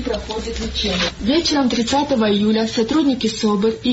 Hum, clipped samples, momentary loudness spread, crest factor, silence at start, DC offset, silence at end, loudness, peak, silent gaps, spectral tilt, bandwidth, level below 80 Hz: none; under 0.1%; 8 LU; 10 dB; 0 s; under 0.1%; 0 s; -18 LUFS; -8 dBFS; none; -4.5 dB/octave; 8 kHz; -36 dBFS